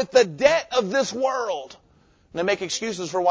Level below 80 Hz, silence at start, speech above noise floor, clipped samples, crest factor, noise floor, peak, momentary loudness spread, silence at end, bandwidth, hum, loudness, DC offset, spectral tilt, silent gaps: -60 dBFS; 0 s; 36 dB; under 0.1%; 20 dB; -58 dBFS; -4 dBFS; 12 LU; 0 s; 8 kHz; none; -23 LUFS; under 0.1%; -3 dB/octave; none